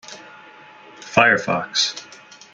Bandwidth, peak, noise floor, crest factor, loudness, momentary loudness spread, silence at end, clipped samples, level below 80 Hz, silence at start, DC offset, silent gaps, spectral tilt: 9.6 kHz; 0 dBFS; -44 dBFS; 22 dB; -18 LUFS; 24 LU; 0.5 s; under 0.1%; -64 dBFS; 0.1 s; under 0.1%; none; -2.5 dB/octave